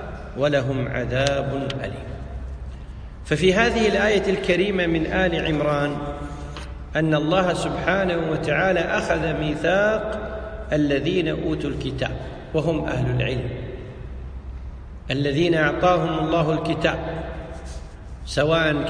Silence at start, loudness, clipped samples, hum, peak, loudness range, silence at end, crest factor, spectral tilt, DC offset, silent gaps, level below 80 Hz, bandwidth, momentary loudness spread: 0 s; -22 LUFS; under 0.1%; none; -2 dBFS; 5 LU; 0 s; 20 dB; -6 dB/octave; under 0.1%; none; -36 dBFS; 10.5 kHz; 17 LU